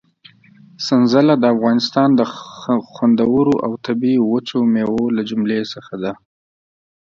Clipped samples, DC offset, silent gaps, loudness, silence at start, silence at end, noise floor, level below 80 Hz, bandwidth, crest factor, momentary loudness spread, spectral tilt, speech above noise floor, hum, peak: under 0.1%; under 0.1%; none; -17 LUFS; 0.8 s; 0.85 s; -48 dBFS; -56 dBFS; 7.2 kHz; 16 dB; 12 LU; -6.5 dB/octave; 33 dB; none; 0 dBFS